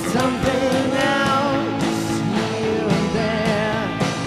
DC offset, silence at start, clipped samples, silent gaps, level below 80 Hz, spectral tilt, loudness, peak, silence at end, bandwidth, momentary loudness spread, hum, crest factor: under 0.1%; 0 s; under 0.1%; none; -44 dBFS; -5 dB/octave; -20 LUFS; -6 dBFS; 0 s; 15 kHz; 4 LU; none; 14 dB